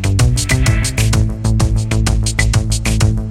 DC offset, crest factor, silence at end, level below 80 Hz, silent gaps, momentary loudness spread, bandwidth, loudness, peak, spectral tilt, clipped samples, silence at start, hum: under 0.1%; 14 dB; 0 s; -18 dBFS; none; 2 LU; 15.5 kHz; -15 LUFS; 0 dBFS; -4.5 dB/octave; under 0.1%; 0 s; none